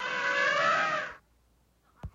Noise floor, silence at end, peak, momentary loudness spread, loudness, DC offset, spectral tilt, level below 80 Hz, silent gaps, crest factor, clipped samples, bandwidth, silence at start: -67 dBFS; 0.05 s; -14 dBFS; 15 LU; -27 LUFS; under 0.1%; -2.5 dB/octave; -58 dBFS; none; 16 dB; under 0.1%; 7.8 kHz; 0 s